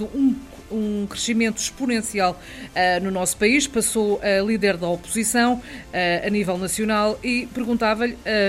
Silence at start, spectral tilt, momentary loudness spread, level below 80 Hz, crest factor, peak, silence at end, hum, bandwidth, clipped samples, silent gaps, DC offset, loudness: 0 s; -3.5 dB/octave; 7 LU; -46 dBFS; 16 dB; -6 dBFS; 0 s; none; 16 kHz; under 0.1%; none; under 0.1%; -22 LUFS